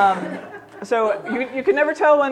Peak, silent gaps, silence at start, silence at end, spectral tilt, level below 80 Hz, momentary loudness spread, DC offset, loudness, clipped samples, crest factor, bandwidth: -4 dBFS; none; 0 s; 0 s; -5.5 dB/octave; -66 dBFS; 18 LU; under 0.1%; -20 LUFS; under 0.1%; 14 dB; 10 kHz